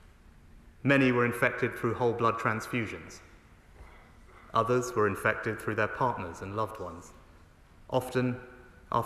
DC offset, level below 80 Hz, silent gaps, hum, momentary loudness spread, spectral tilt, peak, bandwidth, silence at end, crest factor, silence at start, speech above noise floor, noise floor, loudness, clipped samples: under 0.1%; -56 dBFS; none; none; 16 LU; -6 dB/octave; -12 dBFS; 13.5 kHz; 0 s; 20 dB; 0.45 s; 27 dB; -56 dBFS; -29 LUFS; under 0.1%